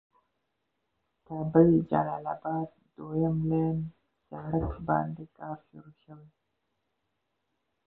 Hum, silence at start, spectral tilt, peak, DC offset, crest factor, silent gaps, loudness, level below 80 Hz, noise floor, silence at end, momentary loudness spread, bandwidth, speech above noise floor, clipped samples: none; 1.3 s; -13 dB/octave; -8 dBFS; under 0.1%; 24 dB; none; -28 LUFS; -52 dBFS; -81 dBFS; 1.65 s; 19 LU; 3.8 kHz; 52 dB; under 0.1%